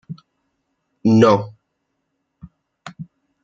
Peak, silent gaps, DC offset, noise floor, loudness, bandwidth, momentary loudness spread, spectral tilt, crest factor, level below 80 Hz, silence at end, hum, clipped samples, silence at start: -2 dBFS; none; under 0.1%; -74 dBFS; -15 LUFS; 7.6 kHz; 26 LU; -7.5 dB/octave; 20 dB; -60 dBFS; 0.4 s; none; under 0.1%; 0.1 s